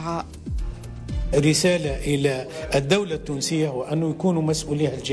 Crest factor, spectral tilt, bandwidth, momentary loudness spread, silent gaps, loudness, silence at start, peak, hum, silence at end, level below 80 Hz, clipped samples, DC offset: 16 dB; -5 dB/octave; 11 kHz; 13 LU; none; -23 LUFS; 0 s; -8 dBFS; none; 0 s; -36 dBFS; under 0.1%; under 0.1%